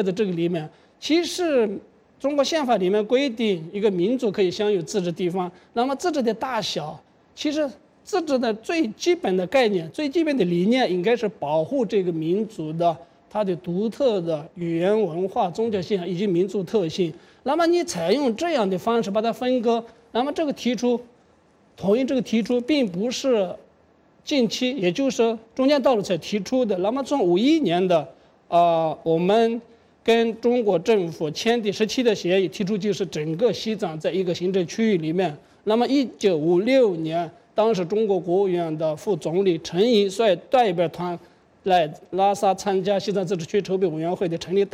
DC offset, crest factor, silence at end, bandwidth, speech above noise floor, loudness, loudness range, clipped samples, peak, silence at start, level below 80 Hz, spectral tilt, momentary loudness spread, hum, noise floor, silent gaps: under 0.1%; 14 dB; 0.05 s; 15.5 kHz; 36 dB; -23 LUFS; 3 LU; under 0.1%; -8 dBFS; 0 s; -64 dBFS; -5.5 dB/octave; 7 LU; none; -58 dBFS; none